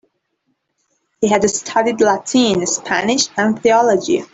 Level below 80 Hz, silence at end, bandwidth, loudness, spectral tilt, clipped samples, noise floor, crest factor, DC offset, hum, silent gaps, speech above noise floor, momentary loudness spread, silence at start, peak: -54 dBFS; 0.1 s; 8.4 kHz; -15 LUFS; -3 dB/octave; under 0.1%; -69 dBFS; 14 dB; under 0.1%; none; none; 54 dB; 4 LU; 1.2 s; -2 dBFS